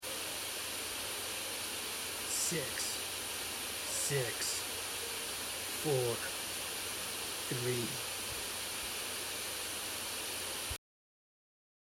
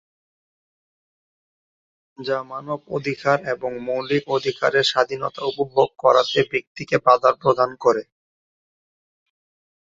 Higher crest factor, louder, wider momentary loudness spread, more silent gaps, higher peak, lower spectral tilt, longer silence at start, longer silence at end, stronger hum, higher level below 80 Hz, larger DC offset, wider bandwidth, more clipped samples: about the same, 18 dB vs 20 dB; second, -36 LUFS vs -21 LUFS; second, 4 LU vs 10 LU; second, none vs 6.67-6.75 s; second, -22 dBFS vs -2 dBFS; second, -1.5 dB/octave vs -4.5 dB/octave; second, 0 s vs 2.2 s; second, 1.15 s vs 1.9 s; neither; about the same, -64 dBFS vs -64 dBFS; neither; first, 16 kHz vs 7.8 kHz; neither